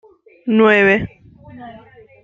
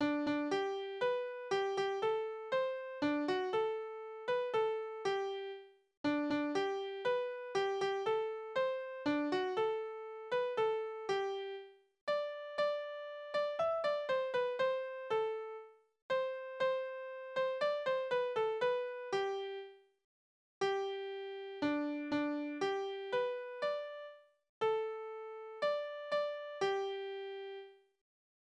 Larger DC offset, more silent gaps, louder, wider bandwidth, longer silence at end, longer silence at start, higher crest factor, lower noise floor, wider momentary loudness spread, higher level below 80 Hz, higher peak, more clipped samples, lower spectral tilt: neither; second, none vs 5.97-6.04 s, 12.01-12.07 s, 16.02-16.09 s, 20.04-20.61 s, 24.49-24.61 s; first, -13 LUFS vs -37 LUFS; second, 7.4 kHz vs 9.8 kHz; second, 0.45 s vs 0.85 s; first, 0.45 s vs 0 s; about the same, 16 dB vs 14 dB; second, -43 dBFS vs under -90 dBFS; first, 25 LU vs 10 LU; first, -48 dBFS vs -80 dBFS; first, -2 dBFS vs -24 dBFS; neither; first, -7 dB/octave vs -4.5 dB/octave